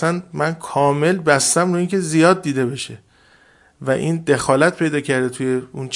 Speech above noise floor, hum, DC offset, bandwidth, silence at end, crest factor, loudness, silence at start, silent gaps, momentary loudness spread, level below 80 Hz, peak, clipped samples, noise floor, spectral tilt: 35 dB; none; under 0.1%; 11.5 kHz; 0 s; 18 dB; -18 LUFS; 0 s; none; 8 LU; -58 dBFS; 0 dBFS; under 0.1%; -52 dBFS; -4.5 dB/octave